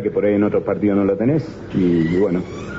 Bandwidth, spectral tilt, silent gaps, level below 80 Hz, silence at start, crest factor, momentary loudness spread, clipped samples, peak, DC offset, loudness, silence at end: 7.8 kHz; -8.5 dB/octave; none; -46 dBFS; 0 s; 10 dB; 5 LU; under 0.1%; -8 dBFS; under 0.1%; -18 LUFS; 0 s